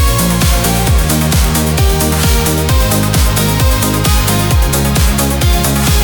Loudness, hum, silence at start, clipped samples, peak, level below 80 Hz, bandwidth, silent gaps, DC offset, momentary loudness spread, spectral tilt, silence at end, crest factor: -11 LUFS; none; 0 s; under 0.1%; 0 dBFS; -14 dBFS; 19.5 kHz; none; under 0.1%; 1 LU; -4.5 dB/octave; 0 s; 10 dB